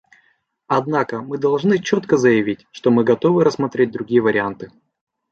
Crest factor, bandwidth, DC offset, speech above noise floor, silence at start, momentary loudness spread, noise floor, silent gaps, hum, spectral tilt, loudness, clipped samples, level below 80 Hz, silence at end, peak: 16 dB; 7.8 kHz; under 0.1%; 45 dB; 0.7 s; 9 LU; -62 dBFS; none; none; -6.5 dB/octave; -18 LUFS; under 0.1%; -60 dBFS; 0.65 s; -2 dBFS